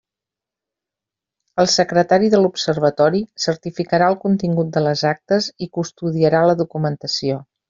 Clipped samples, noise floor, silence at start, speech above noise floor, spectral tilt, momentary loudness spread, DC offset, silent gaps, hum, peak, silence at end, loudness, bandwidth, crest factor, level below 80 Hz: under 0.1%; -87 dBFS; 1.55 s; 70 dB; -5 dB/octave; 9 LU; under 0.1%; none; none; -2 dBFS; 0.25 s; -18 LUFS; 7.6 kHz; 16 dB; -58 dBFS